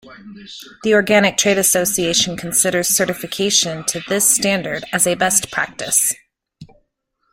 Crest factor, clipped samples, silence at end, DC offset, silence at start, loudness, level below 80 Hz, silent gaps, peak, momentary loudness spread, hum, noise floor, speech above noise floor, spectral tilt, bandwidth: 18 dB; under 0.1%; 0.7 s; under 0.1%; 0.05 s; -16 LUFS; -54 dBFS; none; 0 dBFS; 9 LU; none; -69 dBFS; 51 dB; -2 dB/octave; 16.5 kHz